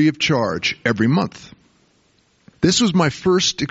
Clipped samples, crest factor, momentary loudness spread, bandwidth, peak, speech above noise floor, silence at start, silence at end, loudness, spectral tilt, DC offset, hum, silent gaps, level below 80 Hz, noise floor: under 0.1%; 16 dB; 5 LU; 8 kHz; -4 dBFS; 42 dB; 0 s; 0.05 s; -18 LUFS; -4 dB/octave; under 0.1%; none; none; -50 dBFS; -60 dBFS